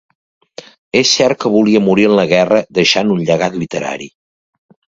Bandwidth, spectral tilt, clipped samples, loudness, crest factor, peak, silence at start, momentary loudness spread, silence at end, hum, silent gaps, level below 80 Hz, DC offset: 7.8 kHz; -4.5 dB/octave; under 0.1%; -13 LUFS; 14 dB; 0 dBFS; 0.95 s; 10 LU; 0.85 s; none; none; -52 dBFS; under 0.1%